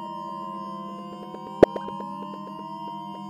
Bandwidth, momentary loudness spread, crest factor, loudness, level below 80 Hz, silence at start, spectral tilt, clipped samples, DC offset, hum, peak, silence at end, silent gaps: 14.5 kHz; 17 LU; 28 dB; -28 LUFS; -54 dBFS; 0 s; -7.5 dB/octave; under 0.1%; under 0.1%; none; 0 dBFS; 0 s; none